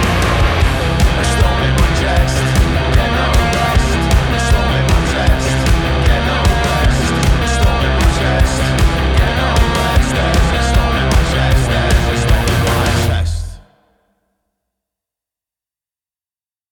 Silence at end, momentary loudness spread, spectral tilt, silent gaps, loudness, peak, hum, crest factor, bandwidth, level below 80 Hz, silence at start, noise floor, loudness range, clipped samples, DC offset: 3.15 s; 1 LU; -5 dB/octave; none; -14 LUFS; 0 dBFS; none; 14 dB; 18.5 kHz; -16 dBFS; 0 s; under -90 dBFS; 4 LU; under 0.1%; under 0.1%